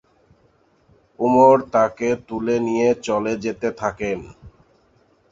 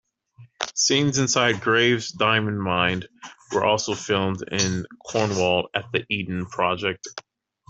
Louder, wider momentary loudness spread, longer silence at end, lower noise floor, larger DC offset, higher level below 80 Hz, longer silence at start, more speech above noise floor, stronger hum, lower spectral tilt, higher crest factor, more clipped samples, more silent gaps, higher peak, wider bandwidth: about the same, -20 LUFS vs -22 LUFS; about the same, 12 LU vs 11 LU; first, 0.8 s vs 0.5 s; first, -59 dBFS vs -52 dBFS; neither; first, -54 dBFS vs -60 dBFS; first, 1.2 s vs 0.4 s; first, 40 dB vs 29 dB; neither; first, -6 dB/octave vs -3.5 dB/octave; about the same, 18 dB vs 20 dB; neither; neither; about the same, -2 dBFS vs -2 dBFS; about the same, 7.8 kHz vs 8.2 kHz